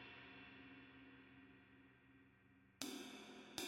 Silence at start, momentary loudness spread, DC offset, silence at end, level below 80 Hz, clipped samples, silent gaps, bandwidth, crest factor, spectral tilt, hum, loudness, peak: 0 s; 18 LU; under 0.1%; 0 s; -84 dBFS; under 0.1%; none; 16 kHz; 32 dB; -2.5 dB/octave; none; -56 LUFS; -26 dBFS